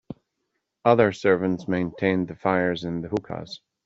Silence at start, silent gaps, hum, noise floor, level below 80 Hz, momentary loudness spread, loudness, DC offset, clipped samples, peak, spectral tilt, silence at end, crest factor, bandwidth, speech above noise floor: 0.1 s; none; none; -78 dBFS; -60 dBFS; 16 LU; -24 LUFS; under 0.1%; under 0.1%; -2 dBFS; -7 dB/octave; 0.3 s; 22 dB; 7.8 kHz; 55 dB